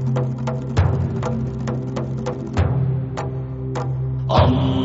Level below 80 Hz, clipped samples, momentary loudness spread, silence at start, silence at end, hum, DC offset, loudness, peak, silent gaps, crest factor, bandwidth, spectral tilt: -34 dBFS; under 0.1%; 9 LU; 0 s; 0 s; none; under 0.1%; -22 LUFS; -2 dBFS; none; 18 dB; 7.8 kHz; -7.5 dB/octave